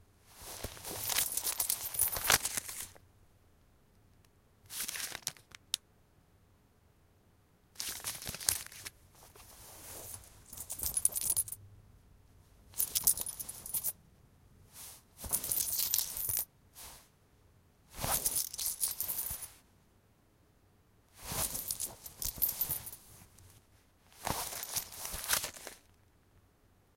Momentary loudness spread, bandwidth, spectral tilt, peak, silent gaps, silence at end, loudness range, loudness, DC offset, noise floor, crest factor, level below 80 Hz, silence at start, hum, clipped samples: 20 LU; 17 kHz; 0 dB/octave; -4 dBFS; none; 1.2 s; 9 LU; -34 LUFS; under 0.1%; -67 dBFS; 36 dB; -60 dBFS; 0.3 s; none; under 0.1%